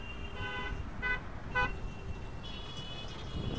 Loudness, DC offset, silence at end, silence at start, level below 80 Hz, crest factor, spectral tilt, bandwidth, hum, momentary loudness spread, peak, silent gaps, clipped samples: -39 LUFS; 0.5%; 0 s; 0 s; -44 dBFS; 20 dB; -5 dB/octave; 8 kHz; none; 10 LU; -18 dBFS; none; under 0.1%